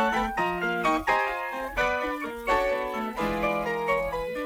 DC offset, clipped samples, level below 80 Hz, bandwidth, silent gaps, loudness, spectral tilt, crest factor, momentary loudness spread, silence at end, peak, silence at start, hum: under 0.1%; under 0.1%; -46 dBFS; over 20 kHz; none; -27 LUFS; -5 dB/octave; 16 dB; 5 LU; 0 s; -10 dBFS; 0 s; none